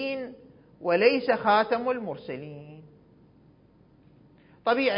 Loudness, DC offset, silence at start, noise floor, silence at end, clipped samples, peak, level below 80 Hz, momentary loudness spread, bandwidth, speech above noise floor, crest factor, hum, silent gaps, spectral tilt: -26 LUFS; under 0.1%; 0 s; -58 dBFS; 0 s; under 0.1%; -6 dBFS; -68 dBFS; 20 LU; 5.4 kHz; 34 dB; 22 dB; none; none; -9 dB/octave